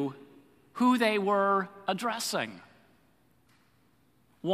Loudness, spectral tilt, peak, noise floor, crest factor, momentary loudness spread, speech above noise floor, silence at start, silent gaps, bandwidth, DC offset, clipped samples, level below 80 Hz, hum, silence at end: -29 LUFS; -4.5 dB/octave; -12 dBFS; -67 dBFS; 20 dB; 13 LU; 39 dB; 0 s; none; 15.5 kHz; under 0.1%; under 0.1%; -80 dBFS; none; 0 s